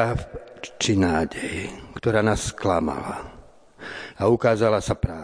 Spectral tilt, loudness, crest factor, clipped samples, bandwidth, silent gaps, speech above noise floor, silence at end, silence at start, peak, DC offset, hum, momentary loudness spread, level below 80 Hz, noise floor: -5.5 dB/octave; -23 LUFS; 18 dB; under 0.1%; 10.5 kHz; none; 22 dB; 0 s; 0 s; -6 dBFS; under 0.1%; none; 18 LU; -42 dBFS; -44 dBFS